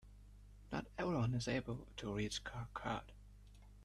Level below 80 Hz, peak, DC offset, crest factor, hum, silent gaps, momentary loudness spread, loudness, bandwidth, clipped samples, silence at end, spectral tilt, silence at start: -58 dBFS; -28 dBFS; under 0.1%; 16 dB; 50 Hz at -55 dBFS; none; 24 LU; -43 LUFS; 12.5 kHz; under 0.1%; 0 s; -5.5 dB/octave; 0.05 s